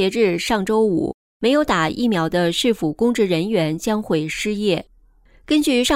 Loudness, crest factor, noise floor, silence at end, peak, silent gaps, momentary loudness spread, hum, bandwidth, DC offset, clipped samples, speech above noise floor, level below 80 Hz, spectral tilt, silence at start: -19 LUFS; 14 dB; -52 dBFS; 0 s; -6 dBFS; 1.14-1.40 s; 5 LU; none; 16 kHz; under 0.1%; under 0.1%; 33 dB; -46 dBFS; -5 dB/octave; 0 s